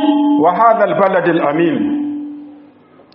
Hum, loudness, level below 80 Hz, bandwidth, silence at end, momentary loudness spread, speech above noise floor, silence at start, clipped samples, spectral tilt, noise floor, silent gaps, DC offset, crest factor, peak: none; -13 LUFS; -64 dBFS; 4.1 kHz; 0.55 s; 14 LU; 32 dB; 0 s; under 0.1%; -5 dB/octave; -44 dBFS; none; under 0.1%; 14 dB; 0 dBFS